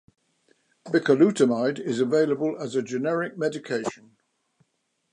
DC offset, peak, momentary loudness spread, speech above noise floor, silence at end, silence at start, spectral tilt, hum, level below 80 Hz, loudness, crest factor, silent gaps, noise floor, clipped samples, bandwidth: under 0.1%; -6 dBFS; 10 LU; 51 dB; 1.2 s; 0.85 s; -6 dB/octave; none; -76 dBFS; -24 LUFS; 18 dB; none; -74 dBFS; under 0.1%; 11 kHz